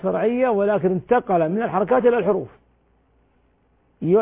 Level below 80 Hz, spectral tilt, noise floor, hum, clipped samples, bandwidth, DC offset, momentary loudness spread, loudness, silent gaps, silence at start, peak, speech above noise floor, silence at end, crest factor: -56 dBFS; -11.5 dB/octave; -62 dBFS; none; under 0.1%; 3.8 kHz; under 0.1%; 7 LU; -20 LUFS; none; 0.05 s; -6 dBFS; 42 dB; 0 s; 14 dB